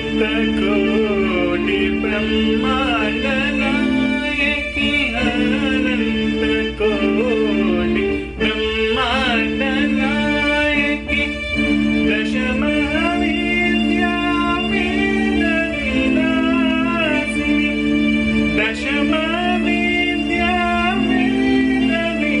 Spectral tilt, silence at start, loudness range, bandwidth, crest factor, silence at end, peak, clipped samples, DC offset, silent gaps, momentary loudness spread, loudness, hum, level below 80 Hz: -5.5 dB/octave; 0 s; 1 LU; 10.5 kHz; 12 dB; 0 s; -6 dBFS; under 0.1%; under 0.1%; none; 2 LU; -17 LUFS; none; -34 dBFS